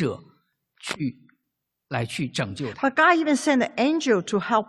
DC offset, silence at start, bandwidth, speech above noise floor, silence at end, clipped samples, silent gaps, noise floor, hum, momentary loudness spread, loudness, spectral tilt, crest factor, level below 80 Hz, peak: under 0.1%; 0 s; 12.5 kHz; 57 dB; 0.05 s; under 0.1%; none; -80 dBFS; none; 14 LU; -23 LUFS; -5 dB/octave; 18 dB; -62 dBFS; -6 dBFS